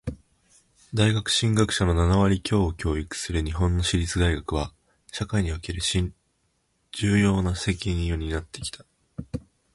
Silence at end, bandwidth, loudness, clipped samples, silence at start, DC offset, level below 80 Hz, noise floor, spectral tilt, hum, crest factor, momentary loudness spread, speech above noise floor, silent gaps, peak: 0.35 s; 11.5 kHz; -25 LUFS; under 0.1%; 0.05 s; under 0.1%; -34 dBFS; -71 dBFS; -5 dB/octave; none; 18 dB; 15 LU; 47 dB; none; -8 dBFS